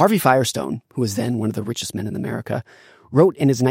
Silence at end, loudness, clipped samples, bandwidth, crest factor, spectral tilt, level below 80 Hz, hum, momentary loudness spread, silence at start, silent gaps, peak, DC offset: 0 s; -21 LUFS; under 0.1%; 17 kHz; 18 dB; -5.5 dB/octave; -62 dBFS; none; 11 LU; 0 s; none; -2 dBFS; under 0.1%